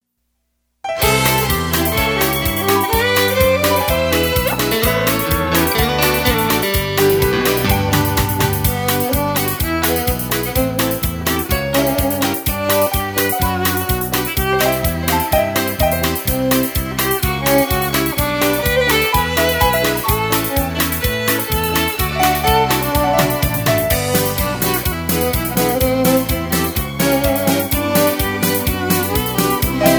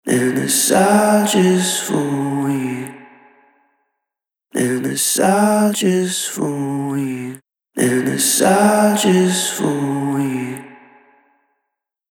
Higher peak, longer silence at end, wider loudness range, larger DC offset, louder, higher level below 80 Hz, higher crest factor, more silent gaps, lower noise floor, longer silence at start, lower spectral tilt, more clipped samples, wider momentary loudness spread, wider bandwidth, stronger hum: about the same, 0 dBFS vs -2 dBFS; second, 0 s vs 1.4 s; second, 2 LU vs 5 LU; neither; about the same, -16 LUFS vs -16 LUFS; first, -28 dBFS vs -66 dBFS; about the same, 16 dB vs 16 dB; neither; second, -69 dBFS vs -83 dBFS; first, 0.85 s vs 0.05 s; about the same, -4 dB/octave vs -4 dB/octave; neither; second, 4 LU vs 12 LU; first, over 20 kHz vs 18 kHz; neither